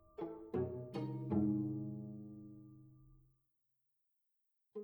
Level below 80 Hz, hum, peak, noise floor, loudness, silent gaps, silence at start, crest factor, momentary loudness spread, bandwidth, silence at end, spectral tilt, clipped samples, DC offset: -72 dBFS; none; -24 dBFS; -84 dBFS; -42 LUFS; none; 0.2 s; 20 dB; 20 LU; over 20 kHz; 0 s; -10.5 dB/octave; under 0.1%; under 0.1%